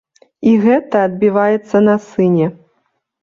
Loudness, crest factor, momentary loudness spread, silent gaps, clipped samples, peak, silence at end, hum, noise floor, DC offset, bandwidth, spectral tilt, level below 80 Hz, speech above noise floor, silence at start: -14 LUFS; 12 dB; 4 LU; none; under 0.1%; -2 dBFS; 0.7 s; none; -66 dBFS; under 0.1%; 7.2 kHz; -8.5 dB/octave; -56 dBFS; 53 dB; 0.4 s